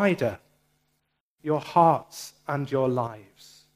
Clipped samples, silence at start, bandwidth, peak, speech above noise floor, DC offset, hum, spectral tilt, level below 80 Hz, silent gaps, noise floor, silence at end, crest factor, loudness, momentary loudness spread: under 0.1%; 0 s; 15.5 kHz; -6 dBFS; 51 dB; under 0.1%; none; -6.5 dB/octave; -68 dBFS; 1.20-1.37 s; -76 dBFS; 0.55 s; 22 dB; -25 LUFS; 19 LU